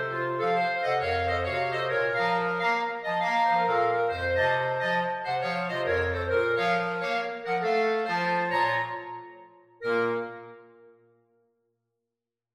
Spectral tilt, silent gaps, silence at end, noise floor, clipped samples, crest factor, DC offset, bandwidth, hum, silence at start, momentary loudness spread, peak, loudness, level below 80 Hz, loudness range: -5.5 dB/octave; none; 1.9 s; -88 dBFS; under 0.1%; 16 dB; under 0.1%; 12 kHz; none; 0 s; 5 LU; -12 dBFS; -27 LUFS; -56 dBFS; 6 LU